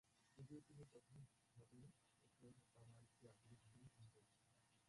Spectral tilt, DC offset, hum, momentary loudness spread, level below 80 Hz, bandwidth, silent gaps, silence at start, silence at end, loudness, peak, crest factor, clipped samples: -6 dB/octave; under 0.1%; none; 7 LU; -86 dBFS; 11.5 kHz; none; 0.05 s; 0 s; -66 LUFS; -48 dBFS; 20 dB; under 0.1%